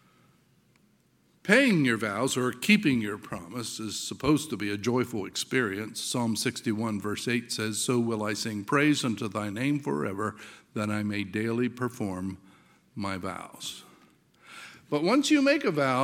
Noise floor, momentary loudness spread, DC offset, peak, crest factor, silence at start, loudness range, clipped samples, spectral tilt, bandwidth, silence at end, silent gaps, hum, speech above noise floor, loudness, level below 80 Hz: -66 dBFS; 15 LU; under 0.1%; -6 dBFS; 22 dB; 1.45 s; 7 LU; under 0.1%; -4.5 dB/octave; 17 kHz; 0 s; none; none; 38 dB; -28 LUFS; -64 dBFS